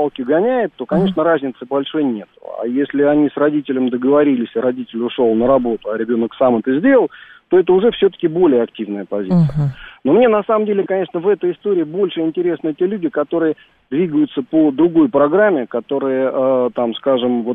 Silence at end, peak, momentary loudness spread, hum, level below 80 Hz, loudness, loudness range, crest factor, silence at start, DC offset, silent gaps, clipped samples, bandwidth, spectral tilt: 0 s; -2 dBFS; 8 LU; none; -50 dBFS; -16 LUFS; 3 LU; 14 dB; 0 s; under 0.1%; none; under 0.1%; 4.6 kHz; -10 dB/octave